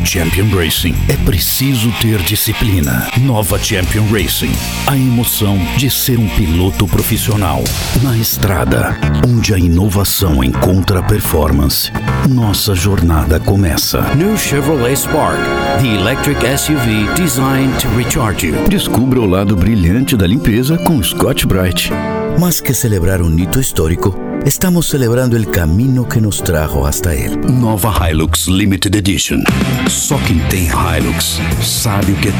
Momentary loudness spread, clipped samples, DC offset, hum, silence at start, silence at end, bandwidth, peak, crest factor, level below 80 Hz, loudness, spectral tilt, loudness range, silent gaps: 2 LU; under 0.1%; under 0.1%; none; 0 s; 0 s; over 20 kHz; 0 dBFS; 12 dB; -22 dBFS; -13 LUFS; -5 dB/octave; 1 LU; none